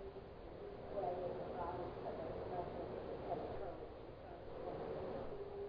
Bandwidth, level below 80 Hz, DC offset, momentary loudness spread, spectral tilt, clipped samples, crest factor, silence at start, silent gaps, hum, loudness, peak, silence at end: 5.2 kHz; -60 dBFS; under 0.1%; 9 LU; -6 dB/octave; under 0.1%; 16 dB; 0 s; none; none; -47 LUFS; -30 dBFS; 0 s